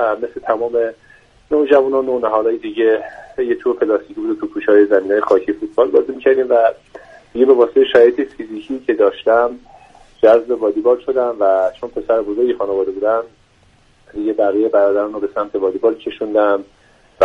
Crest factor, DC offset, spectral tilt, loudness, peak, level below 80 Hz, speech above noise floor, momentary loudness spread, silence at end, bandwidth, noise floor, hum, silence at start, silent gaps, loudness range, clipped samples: 16 dB; under 0.1%; -6.5 dB/octave; -16 LUFS; 0 dBFS; -54 dBFS; 37 dB; 11 LU; 0 s; 6.2 kHz; -52 dBFS; none; 0 s; none; 4 LU; under 0.1%